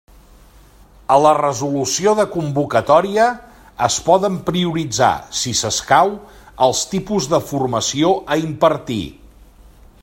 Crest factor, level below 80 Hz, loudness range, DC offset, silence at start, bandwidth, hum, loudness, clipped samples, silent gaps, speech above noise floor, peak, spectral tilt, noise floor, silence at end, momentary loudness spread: 18 dB; -46 dBFS; 2 LU; under 0.1%; 1.1 s; 16.5 kHz; none; -17 LUFS; under 0.1%; none; 29 dB; 0 dBFS; -4 dB/octave; -46 dBFS; 0.9 s; 7 LU